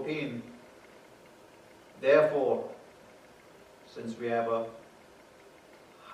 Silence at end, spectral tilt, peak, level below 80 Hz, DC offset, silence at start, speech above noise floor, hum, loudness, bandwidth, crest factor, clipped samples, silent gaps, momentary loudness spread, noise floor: 0 s; -6 dB/octave; -10 dBFS; -76 dBFS; under 0.1%; 0 s; 27 dB; none; -30 LUFS; 12.5 kHz; 22 dB; under 0.1%; none; 27 LU; -56 dBFS